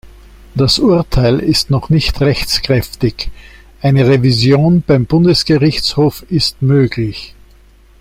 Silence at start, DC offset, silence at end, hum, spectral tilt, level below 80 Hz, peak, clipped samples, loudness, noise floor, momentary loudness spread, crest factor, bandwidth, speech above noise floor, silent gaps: 0.05 s; under 0.1%; 0.75 s; none; -6 dB/octave; -30 dBFS; 0 dBFS; under 0.1%; -12 LUFS; -44 dBFS; 8 LU; 12 dB; 16 kHz; 32 dB; none